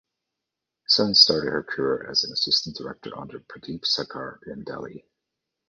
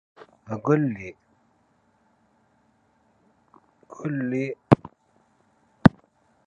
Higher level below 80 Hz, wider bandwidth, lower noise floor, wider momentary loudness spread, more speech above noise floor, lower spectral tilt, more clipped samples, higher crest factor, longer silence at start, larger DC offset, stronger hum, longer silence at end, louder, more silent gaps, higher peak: second, -60 dBFS vs -54 dBFS; about the same, 9.6 kHz vs 8.8 kHz; first, -85 dBFS vs -65 dBFS; first, 23 LU vs 17 LU; first, 60 dB vs 40 dB; second, -3 dB/octave vs -8.5 dB/octave; neither; about the same, 24 dB vs 28 dB; first, 0.9 s vs 0.5 s; neither; neither; about the same, 0.7 s vs 0.6 s; first, -20 LUFS vs -24 LUFS; neither; about the same, -2 dBFS vs 0 dBFS